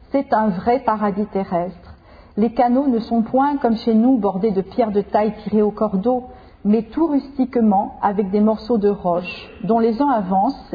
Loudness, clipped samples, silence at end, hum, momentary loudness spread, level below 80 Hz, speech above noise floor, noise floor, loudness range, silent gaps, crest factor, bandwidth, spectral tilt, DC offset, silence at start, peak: -19 LUFS; under 0.1%; 0 s; none; 6 LU; -48 dBFS; 25 dB; -43 dBFS; 2 LU; none; 14 dB; 5 kHz; -10 dB/octave; under 0.1%; 0.15 s; -4 dBFS